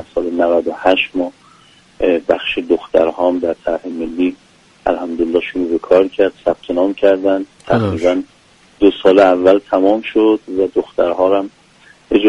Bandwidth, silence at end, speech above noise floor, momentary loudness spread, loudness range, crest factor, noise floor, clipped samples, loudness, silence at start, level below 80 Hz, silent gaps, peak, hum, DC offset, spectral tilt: 10 kHz; 0 s; 33 dB; 8 LU; 4 LU; 14 dB; -47 dBFS; under 0.1%; -15 LUFS; 0 s; -46 dBFS; none; 0 dBFS; none; under 0.1%; -6.5 dB/octave